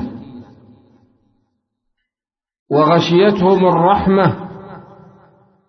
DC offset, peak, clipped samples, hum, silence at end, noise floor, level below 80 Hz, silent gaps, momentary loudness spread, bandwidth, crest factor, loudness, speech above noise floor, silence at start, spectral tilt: under 0.1%; -2 dBFS; under 0.1%; none; 0.85 s; under -90 dBFS; -46 dBFS; 2.59-2.66 s; 22 LU; 6.4 kHz; 16 dB; -13 LUFS; over 78 dB; 0 s; -7.5 dB/octave